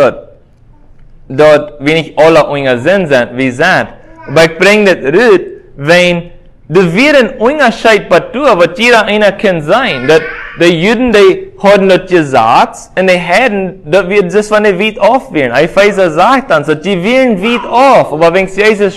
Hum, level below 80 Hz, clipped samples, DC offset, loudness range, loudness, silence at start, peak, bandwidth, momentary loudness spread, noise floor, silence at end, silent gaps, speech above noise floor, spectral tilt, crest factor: none; -40 dBFS; 3%; under 0.1%; 1 LU; -8 LUFS; 0 s; 0 dBFS; 16 kHz; 6 LU; -39 dBFS; 0 s; none; 32 dB; -5 dB/octave; 8 dB